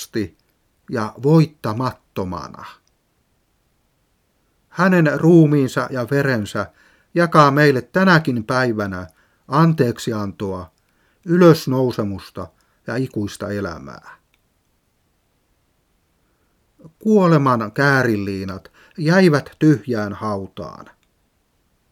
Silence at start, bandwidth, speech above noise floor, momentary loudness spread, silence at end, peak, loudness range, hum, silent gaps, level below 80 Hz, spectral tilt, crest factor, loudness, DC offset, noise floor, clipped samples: 0 s; 15.5 kHz; 47 dB; 20 LU; 1.2 s; 0 dBFS; 13 LU; none; none; -56 dBFS; -7 dB/octave; 20 dB; -18 LUFS; under 0.1%; -65 dBFS; under 0.1%